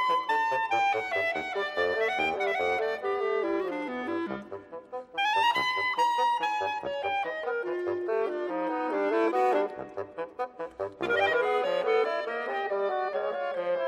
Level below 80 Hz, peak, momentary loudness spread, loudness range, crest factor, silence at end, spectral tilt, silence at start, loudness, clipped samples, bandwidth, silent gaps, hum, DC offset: -70 dBFS; -14 dBFS; 11 LU; 2 LU; 14 dB; 0 s; -4 dB/octave; 0 s; -29 LUFS; under 0.1%; 14 kHz; none; none; under 0.1%